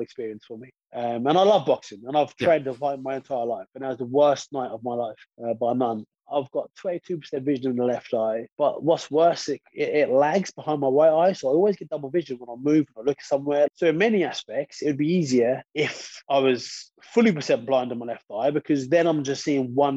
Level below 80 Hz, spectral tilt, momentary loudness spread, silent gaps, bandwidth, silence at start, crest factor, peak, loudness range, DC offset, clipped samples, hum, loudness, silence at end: -72 dBFS; -5.5 dB/octave; 11 LU; 8.52-8.56 s; 8.2 kHz; 0 s; 16 dB; -6 dBFS; 5 LU; under 0.1%; under 0.1%; none; -24 LUFS; 0 s